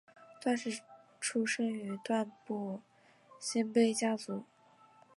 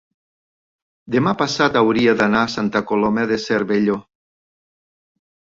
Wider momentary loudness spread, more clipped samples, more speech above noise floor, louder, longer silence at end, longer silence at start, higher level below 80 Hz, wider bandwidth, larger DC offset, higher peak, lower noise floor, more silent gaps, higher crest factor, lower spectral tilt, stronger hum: first, 13 LU vs 6 LU; neither; second, 29 dB vs over 73 dB; second, -35 LUFS vs -18 LUFS; second, 0.75 s vs 1.55 s; second, 0.2 s vs 1.05 s; second, -88 dBFS vs -56 dBFS; first, 11.5 kHz vs 7.8 kHz; neither; second, -16 dBFS vs -2 dBFS; second, -63 dBFS vs under -90 dBFS; neither; about the same, 20 dB vs 18 dB; second, -4 dB/octave vs -5.5 dB/octave; neither